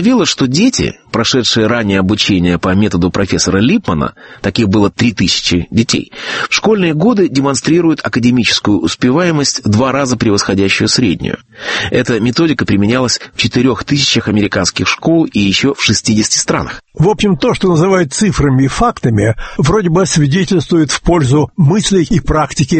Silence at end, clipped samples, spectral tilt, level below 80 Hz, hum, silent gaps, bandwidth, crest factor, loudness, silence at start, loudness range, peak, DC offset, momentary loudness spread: 0 s; under 0.1%; -4.5 dB/octave; -32 dBFS; none; none; 8.8 kHz; 12 dB; -12 LUFS; 0 s; 1 LU; 0 dBFS; under 0.1%; 4 LU